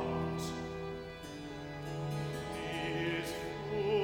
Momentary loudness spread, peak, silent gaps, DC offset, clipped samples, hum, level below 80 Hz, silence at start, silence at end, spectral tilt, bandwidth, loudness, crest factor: 9 LU; -22 dBFS; none; under 0.1%; under 0.1%; none; -56 dBFS; 0 s; 0 s; -5.5 dB/octave; 17.5 kHz; -39 LUFS; 16 dB